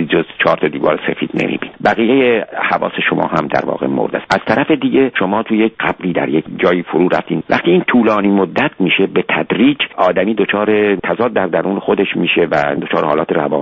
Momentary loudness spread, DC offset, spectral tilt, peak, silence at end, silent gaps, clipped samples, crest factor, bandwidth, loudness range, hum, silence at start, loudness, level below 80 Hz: 5 LU; under 0.1%; -7 dB/octave; 0 dBFS; 0 s; none; under 0.1%; 14 dB; 8 kHz; 2 LU; none; 0 s; -14 LUFS; -50 dBFS